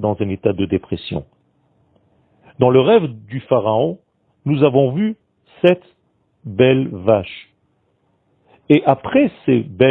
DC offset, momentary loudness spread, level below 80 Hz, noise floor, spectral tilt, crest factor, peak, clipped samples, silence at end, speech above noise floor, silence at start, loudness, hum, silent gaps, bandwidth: under 0.1%; 14 LU; -52 dBFS; -63 dBFS; -10 dB/octave; 18 dB; 0 dBFS; under 0.1%; 0 s; 48 dB; 0 s; -17 LUFS; none; none; 4.5 kHz